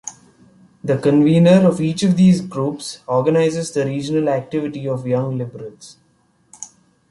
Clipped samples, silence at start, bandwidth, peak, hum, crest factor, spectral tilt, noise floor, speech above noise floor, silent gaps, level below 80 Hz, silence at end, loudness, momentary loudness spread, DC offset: under 0.1%; 0.05 s; 11.5 kHz; -2 dBFS; none; 16 dB; -7 dB/octave; -59 dBFS; 43 dB; none; -56 dBFS; 0.45 s; -17 LUFS; 22 LU; under 0.1%